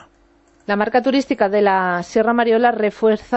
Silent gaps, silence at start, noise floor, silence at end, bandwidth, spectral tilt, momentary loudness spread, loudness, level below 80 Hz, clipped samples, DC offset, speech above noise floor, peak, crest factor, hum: none; 0.7 s; -55 dBFS; 0 s; 8.2 kHz; -6 dB/octave; 4 LU; -17 LUFS; -56 dBFS; under 0.1%; under 0.1%; 38 dB; -4 dBFS; 14 dB; none